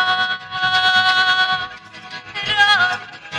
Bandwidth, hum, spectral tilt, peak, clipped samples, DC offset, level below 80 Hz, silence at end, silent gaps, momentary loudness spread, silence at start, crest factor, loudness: 13 kHz; none; -1 dB/octave; -4 dBFS; under 0.1%; under 0.1%; -56 dBFS; 0 s; none; 17 LU; 0 s; 14 dB; -15 LUFS